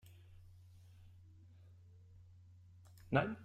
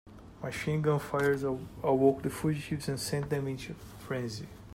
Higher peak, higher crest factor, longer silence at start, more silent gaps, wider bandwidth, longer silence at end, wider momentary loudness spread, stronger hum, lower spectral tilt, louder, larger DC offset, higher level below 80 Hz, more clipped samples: second, -18 dBFS vs -12 dBFS; first, 28 dB vs 20 dB; first, 3.1 s vs 0.05 s; neither; second, 14.5 kHz vs 16 kHz; about the same, 0 s vs 0 s; first, 26 LU vs 14 LU; neither; first, -8 dB/octave vs -6 dB/octave; second, -37 LUFS vs -32 LUFS; neither; second, -70 dBFS vs -56 dBFS; neither